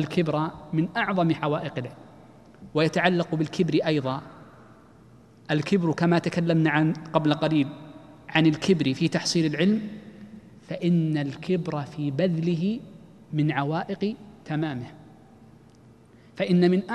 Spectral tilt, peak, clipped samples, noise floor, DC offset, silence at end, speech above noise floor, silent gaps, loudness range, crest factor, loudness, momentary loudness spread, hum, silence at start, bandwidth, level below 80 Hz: -6.5 dB/octave; -4 dBFS; under 0.1%; -53 dBFS; under 0.1%; 0 s; 28 dB; none; 5 LU; 22 dB; -25 LUFS; 14 LU; none; 0 s; 11 kHz; -62 dBFS